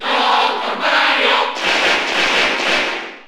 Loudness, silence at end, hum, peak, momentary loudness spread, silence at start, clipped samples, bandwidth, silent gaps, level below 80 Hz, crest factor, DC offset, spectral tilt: -14 LUFS; 0 s; none; -2 dBFS; 4 LU; 0 s; under 0.1%; over 20 kHz; none; -52 dBFS; 14 dB; under 0.1%; -1 dB/octave